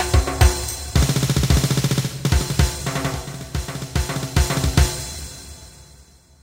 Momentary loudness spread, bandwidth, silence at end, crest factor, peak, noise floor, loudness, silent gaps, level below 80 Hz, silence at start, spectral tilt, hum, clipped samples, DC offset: 12 LU; 16.5 kHz; 0.4 s; 18 dB; -2 dBFS; -49 dBFS; -21 LUFS; none; -24 dBFS; 0 s; -4.5 dB/octave; none; under 0.1%; under 0.1%